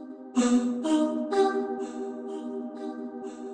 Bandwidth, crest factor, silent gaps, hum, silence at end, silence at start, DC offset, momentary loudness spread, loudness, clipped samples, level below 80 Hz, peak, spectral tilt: 9.8 kHz; 16 dB; none; none; 0 s; 0 s; under 0.1%; 12 LU; -29 LUFS; under 0.1%; -76 dBFS; -12 dBFS; -4 dB/octave